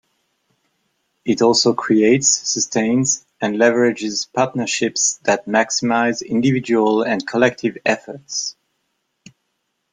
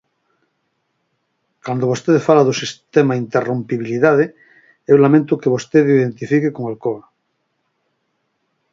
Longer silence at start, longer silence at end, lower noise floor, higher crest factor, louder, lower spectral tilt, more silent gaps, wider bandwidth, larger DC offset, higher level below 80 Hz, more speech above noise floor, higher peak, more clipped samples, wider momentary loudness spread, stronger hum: second, 1.25 s vs 1.65 s; second, 1.4 s vs 1.75 s; about the same, -72 dBFS vs -70 dBFS; about the same, 18 dB vs 18 dB; about the same, -17 LUFS vs -16 LUFS; second, -3 dB/octave vs -6.5 dB/octave; neither; first, 9.8 kHz vs 7.6 kHz; neither; about the same, -60 dBFS vs -64 dBFS; about the same, 55 dB vs 54 dB; about the same, -2 dBFS vs 0 dBFS; neither; about the same, 9 LU vs 11 LU; neither